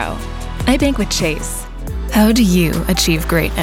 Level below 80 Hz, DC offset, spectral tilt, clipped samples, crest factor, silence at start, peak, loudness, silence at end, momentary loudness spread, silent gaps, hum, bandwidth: -24 dBFS; under 0.1%; -4.5 dB/octave; under 0.1%; 14 dB; 0 s; -2 dBFS; -16 LUFS; 0 s; 14 LU; none; none; 17 kHz